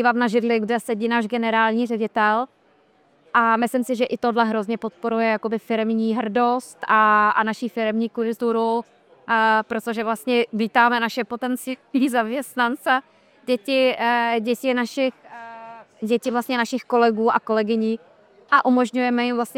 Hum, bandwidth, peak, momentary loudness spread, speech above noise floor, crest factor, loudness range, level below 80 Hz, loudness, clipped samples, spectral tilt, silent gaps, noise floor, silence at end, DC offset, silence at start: none; 16.5 kHz; -2 dBFS; 8 LU; 38 dB; 18 dB; 2 LU; -70 dBFS; -21 LUFS; under 0.1%; -4.5 dB/octave; none; -59 dBFS; 0.05 s; under 0.1%; 0 s